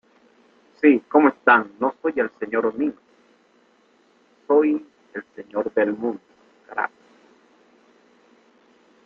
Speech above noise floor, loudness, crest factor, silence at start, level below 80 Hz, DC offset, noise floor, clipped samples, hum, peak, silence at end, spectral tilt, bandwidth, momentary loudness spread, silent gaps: 39 dB; -21 LUFS; 22 dB; 0.85 s; -70 dBFS; under 0.1%; -59 dBFS; under 0.1%; 60 Hz at -65 dBFS; -2 dBFS; 2.2 s; -7.5 dB/octave; 4.3 kHz; 17 LU; none